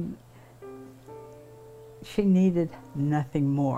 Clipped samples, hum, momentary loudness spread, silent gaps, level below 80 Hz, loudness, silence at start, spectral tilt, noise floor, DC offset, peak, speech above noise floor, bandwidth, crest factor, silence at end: under 0.1%; none; 26 LU; none; -56 dBFS; -26 LUFS; 0 s; -9 dB/octave; -50 dBFS; under 0.1%; -14 dBFS; 25 dB; 9.4 kHz; 14 dB; 0 s